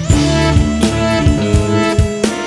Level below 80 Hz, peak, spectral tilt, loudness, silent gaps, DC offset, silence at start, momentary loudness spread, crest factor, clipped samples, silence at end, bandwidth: -22 dBFS; 0 dBFS; -5.5 dB/octave; -13 LUFS; none; under 0.1%; 0 s; 2 LU; 12 dB; under 0.1%; 0 s; 12 kHz